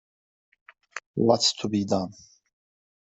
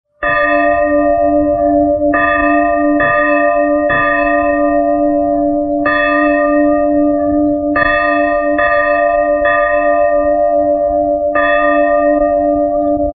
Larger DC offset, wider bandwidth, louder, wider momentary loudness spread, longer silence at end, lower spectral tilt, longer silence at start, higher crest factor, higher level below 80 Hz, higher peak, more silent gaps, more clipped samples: neither; first, 8.2 kHz vs 4.6 kHz; second, -24 LUFS vs -12 LUFS; first, 19 LU vs 2 LU; first, 0.95 s vs 0.05 s; second, -4 dB/octave vs -11 dB/octave; first, 0.95 s vs 0.2 s; first, 22 dB vs 12 dB; second, -66 dBFS vs -36 dBFS; second, -6 dBFS vs 0 dBFS; first, 1.06-1.14 s vs none; neither